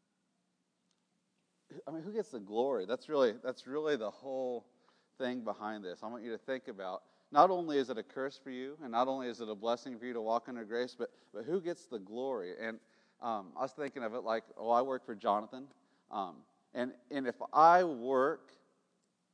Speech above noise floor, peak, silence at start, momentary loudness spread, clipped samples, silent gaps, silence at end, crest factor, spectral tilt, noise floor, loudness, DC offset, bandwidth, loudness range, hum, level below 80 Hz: 46 dB; -10 dBFS; 1.7 s; 15 LU; under 0.1%; none; 0.95 s; 26 dB; -5.5 dB/octave; -81 dBFS; -36 LUFS; under 0.1%; 10 kHz; 8 LU; none; under -90 dBFS